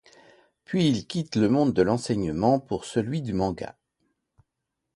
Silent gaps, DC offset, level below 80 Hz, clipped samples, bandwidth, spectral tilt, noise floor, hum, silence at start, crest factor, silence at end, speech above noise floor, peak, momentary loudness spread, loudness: none; under 0.1%; -52 dBFS; under 0.1%; 11.5 kHz; -6.5 dB/octave; -83 dBFS; none; 0.7 s; 20 dB; 1.25 s; 58 dB; -6 dBFS; 8 LU; -25 LUFS